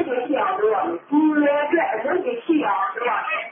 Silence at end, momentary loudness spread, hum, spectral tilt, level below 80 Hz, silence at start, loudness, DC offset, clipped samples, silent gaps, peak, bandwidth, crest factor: 0 s; 5 LU; none; -9.5 dB/octave; -76 dBFS; 0 s; -21 LUFS; under 0.1%; under 0.1%; none; -8 dBFS; 3.6 kHz; 12 dB